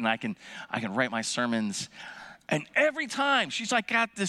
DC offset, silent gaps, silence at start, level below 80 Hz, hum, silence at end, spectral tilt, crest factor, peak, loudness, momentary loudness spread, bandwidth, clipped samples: under 0.1%; none; 0 s; -74 dBFS; none; 0 s; -3.5 dB/octave; 20 dB; -10 dBFS; -28 LUFS; 14 LU; 13 kHz; under 0.1%